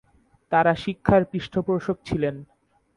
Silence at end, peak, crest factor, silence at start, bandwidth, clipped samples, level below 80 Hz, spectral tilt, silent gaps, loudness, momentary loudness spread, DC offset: 0.55 s; -4 dBFS; 22 dB; 0.5 s; 11 kHz; under 0.1%; -48 dBFS; -7.5 dB/octave; none; -23 LUFS; 7 LU; under 0.1%